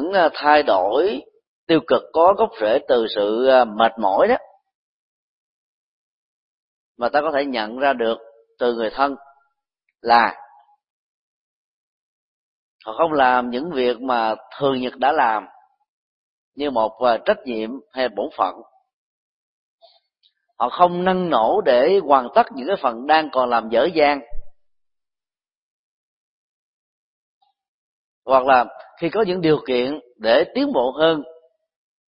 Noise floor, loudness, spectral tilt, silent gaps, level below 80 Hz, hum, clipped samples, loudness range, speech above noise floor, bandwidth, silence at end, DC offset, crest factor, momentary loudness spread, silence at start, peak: under -90 dBFS; -19 LUFS; -9 dB/octave; 1.47-1.67 s, 4.74-6.95 s, 10.90-12.79 s, 15.89-16.52 s, 18.93-19.79 s, 25.55-27.41 s, 27.68-28.22 s; -52 dBFS; none; under 0.1%; 7 LU; over 72 dB; 5.6 kHz; 0.75 s; under 0.1%; 20 dB; 10 LU; 0 s; 0 dBFS